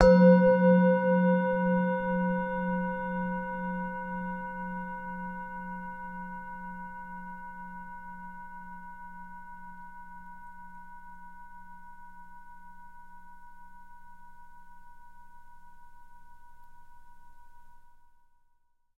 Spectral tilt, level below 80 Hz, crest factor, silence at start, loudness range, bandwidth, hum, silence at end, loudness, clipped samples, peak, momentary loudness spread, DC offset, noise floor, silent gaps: -9 dB/octave; -50 dBFS; 26 dB; 0 s; 26 LU; 5.8 kHz; none; 1.05 s; -28 LUFS; under 0.1%; -4 dBFS; 27 LU; under 0.1%; -67 dBFS; none